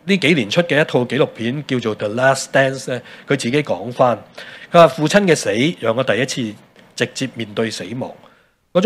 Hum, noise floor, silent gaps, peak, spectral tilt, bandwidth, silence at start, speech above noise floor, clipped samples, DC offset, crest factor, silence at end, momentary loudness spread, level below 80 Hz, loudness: none; -37 dBFS; none; 0 dBFS; -5 dB/octave; 15 kHz; 0.05 s; 20 dB; under 0.1%; under 0.1%; 18 dB; 0 s; 13 LU; -60 dBFS; -17 LUFS